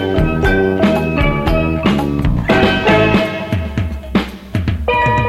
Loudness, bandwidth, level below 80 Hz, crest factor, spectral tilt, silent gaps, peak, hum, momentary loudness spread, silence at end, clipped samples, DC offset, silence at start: -15 LUFS; 15.5 kHz; -24 dBFS; 14 dB; -7 dB/octave; none; 0 dBFS; none; 8 LU; 0 s; under 0.1%; under 0.1%; 0 s